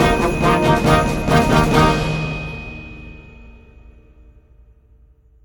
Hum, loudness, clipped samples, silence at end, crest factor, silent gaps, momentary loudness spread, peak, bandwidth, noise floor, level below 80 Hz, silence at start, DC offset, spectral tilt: none; -16 LUFS; under 0.1%; 1.95 s; 18 dB; none; 20 LU; 0 dBFS; 19 kHz; -50 dBFS; -30 dBFS; 0 s; under 0.1%; -6 dB/octave